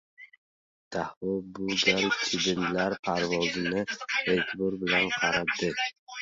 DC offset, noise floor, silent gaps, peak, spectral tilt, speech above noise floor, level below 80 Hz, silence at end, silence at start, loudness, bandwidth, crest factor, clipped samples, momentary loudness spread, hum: under 0.1%; under -90 dBFS; 0.38-0.91 s, 1.17-1.21 s, 2.99-3.03 s, 5.99-6.07 s; -8 dBFS; -3.5 dB/octave; over 62 dB; -60 dBFS; 0 s; 0.2 s; -28 LUFS; 7.8 kHz; 22 dB; under 0.1%; 9 LU; none